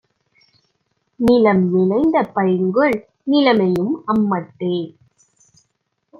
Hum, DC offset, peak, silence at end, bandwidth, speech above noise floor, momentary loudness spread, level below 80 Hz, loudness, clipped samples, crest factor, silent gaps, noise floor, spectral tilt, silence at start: none; under 0.1%; -2 dBFS; 1.3 s; 12 kHz; 55 dB; 9 LU; -52 dBFS; -17 LUFS; under 0.1%; 16 dB; none; -71 dBFS; -8 dB/octave; 1.2 s